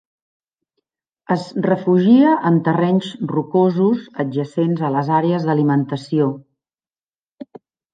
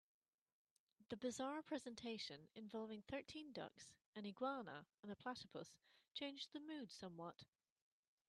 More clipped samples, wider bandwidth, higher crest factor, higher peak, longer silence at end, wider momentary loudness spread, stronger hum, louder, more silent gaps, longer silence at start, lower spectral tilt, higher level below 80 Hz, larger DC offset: neither; second, 9.2 kHz vs 12 kHz; about the same, 16 dB vs 20 dB; first, -2 dBFS vs -34 dBFS; second, 0.5 s vs 0.85 s; about the same, 10 LU vs 10 LU; neither; first, -17 LUFS vs -52 LUFS; first, 7.03-7.12 s, 7.19-7.23 s, 7.31-7.37 s vs 4.06-4.13 s, 4.99-5.03 s; first, 1.3 s vs 1 s; first, -9 dB/octave vs -4 dB/octave; first, -68 dBFS vs -86 dBFS; neither